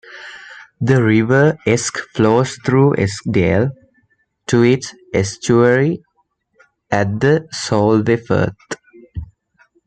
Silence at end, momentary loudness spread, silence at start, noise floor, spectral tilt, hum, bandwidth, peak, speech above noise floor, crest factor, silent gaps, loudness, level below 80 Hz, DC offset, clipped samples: 0.6 s; 19 LU; 0.1 s; -65 dBFS; -6 dB/octave; none; 9.4 kHz; -2 dBFS; 50 dB; 14 dB; none; -16 LUFS; -46 dBFS; under 0.1%; under 0.1%